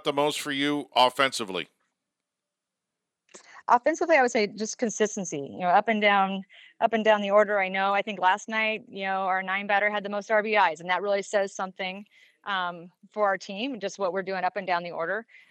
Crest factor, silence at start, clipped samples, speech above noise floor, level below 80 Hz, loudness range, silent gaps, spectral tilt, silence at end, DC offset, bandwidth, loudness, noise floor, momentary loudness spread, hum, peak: 20 dB; 0.05 s; under 0.1%; 61 dB; -86 dBFS; 6 LU; none; -3.5 dB/octave; 0.25 s; under 0.1%; 15 kHz; -26 LUFS; -87 dBFS; 11 LU; none; -6 dBFS